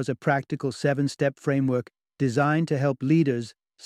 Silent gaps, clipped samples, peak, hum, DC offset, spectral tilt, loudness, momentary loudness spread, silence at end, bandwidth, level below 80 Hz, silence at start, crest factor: none; under 0.1%; -8 dBFS; none; under 0.1%; -7 dB/octave; -25 LUFS; 7 LU; 0.35 s; 11 kHz; -66 dBFS; 0 s; 16 dB